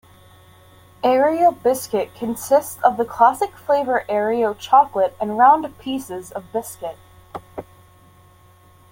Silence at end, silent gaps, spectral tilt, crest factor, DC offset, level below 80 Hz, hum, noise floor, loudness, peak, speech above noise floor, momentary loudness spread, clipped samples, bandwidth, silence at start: 1.3 s; none; -4.5 dB/octave; 18 dB; under 0.1%; -58 dBFS; none; -50 dBFS; -19 LUFS; -2 dBFS; 32 dB; 18 LU; under 0.1%; 17 kHz; 1.05 s